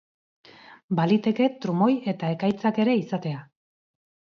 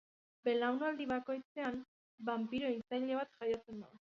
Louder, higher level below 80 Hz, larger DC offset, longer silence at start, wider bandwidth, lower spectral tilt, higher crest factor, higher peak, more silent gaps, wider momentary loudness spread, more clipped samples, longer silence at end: first, -24 LUFS vs -39 LUFS; first, -68 dBFS vs -76 dBFS; neither; first, 0.7 s vs 0.45 s; about the same, 6.8 kHz vs 7.2 kHz; first, -8.5 dB/octave vs -3 dB/octave; about the same, 16 dB vs 16 dB; first, -10 dBFS vs -24 dBFS; second, 0.84-0.89 s vs 1.45-1.55 s, 1.88-2.18 s; about the same, 8 LU vs 9 LU; neither; first, 0.9 s vs 0.15 s